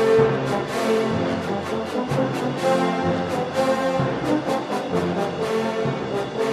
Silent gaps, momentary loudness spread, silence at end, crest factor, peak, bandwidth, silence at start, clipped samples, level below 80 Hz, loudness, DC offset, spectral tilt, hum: none; 5 LU; 0 s; 16 dB; -6 dBFS; 14 kHz; 0 s; under 0.1%; -54 dBFS; -23 LUFS; under 0.1%; -6 dB/octave; none